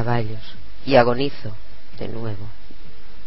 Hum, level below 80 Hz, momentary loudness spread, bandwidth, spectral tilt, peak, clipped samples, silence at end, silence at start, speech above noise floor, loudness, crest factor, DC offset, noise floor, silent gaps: none; -44 dBFS; 23 LU; 5.8 kHz; -10.5 dB/octave; 0 dBFS; under 0.1%; 0 s; 0 s; 20 dB; -21 LUFS; 22 dB; 10%; -42 dBFS; none